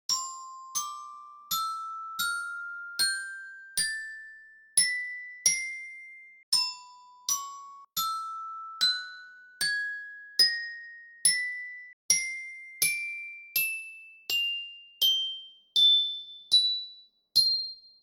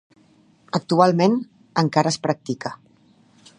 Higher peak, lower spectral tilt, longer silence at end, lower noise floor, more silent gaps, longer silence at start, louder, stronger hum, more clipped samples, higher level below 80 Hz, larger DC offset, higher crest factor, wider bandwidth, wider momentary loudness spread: second, -10 dBFS vs -2 dBFS; second, 3.5 dB/octave vs -6 dB/octave; second, 0.15 s vs 0.85 s; second, -52 dBFS vs -56 dBFS; first, 6.43-6.52 s, 11.93-12.09 s vs none; second, 0.1 s vs 0.75 s; second, -27 LUFS vs -21 LUFS; neither; neither; second, -74 dBFS vs -66 dBFS; neither; about the same, 22 dB vs 20 dB; first, over 20 kHz vs 11 kHz; first, 19 LU vs 12 LU